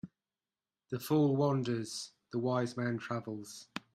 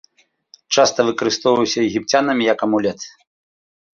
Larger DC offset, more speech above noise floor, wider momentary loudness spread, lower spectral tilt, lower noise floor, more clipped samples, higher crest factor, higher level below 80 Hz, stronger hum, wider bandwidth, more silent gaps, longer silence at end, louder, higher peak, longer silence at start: neither; first, over 56 dB vs 35 dB; first, 15 LU vs 6 LU; first, -6.5 dB/octave vs -3.5 dB/octave; first, under -90 dBFS vs -52 dBFS; neither; about the same, 18 dB vs 18 dB; second, -76 dBFS vs -60 dBFS; neither; first, 16 kHz vs 7.4 kHz; neither; second, 0.15 s vs 0.85 s; second, -34 LUFS vs -17 LUFS; second, -18 dBFS vs -2 dBFS; second, 0.05 s vs 0.7 s